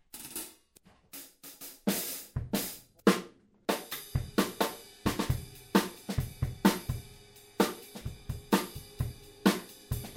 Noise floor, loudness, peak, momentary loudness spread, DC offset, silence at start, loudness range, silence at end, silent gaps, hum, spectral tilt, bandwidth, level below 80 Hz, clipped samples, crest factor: -63 dBFS; -33 LUFS; -8 dBFS; 17 LU; under 0.1%; 0.15 s; 2 LU; 0 s; none; none; -5 dB/octave; 16.5 kHz; -48 dBFS; under 0.1%; 26 dB